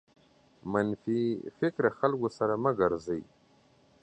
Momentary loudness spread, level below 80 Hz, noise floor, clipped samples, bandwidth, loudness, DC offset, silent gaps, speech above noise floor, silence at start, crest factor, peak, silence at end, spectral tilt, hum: 7 LU; -64 dBFS; -64 dBFS; under 0.1%; 8.8 kHz; -30 LUFS; under 0.1%; none; 34 dB; 0.65 s; 22 dB; -10 dBFS; 0.8 s; -8 dB/octave; none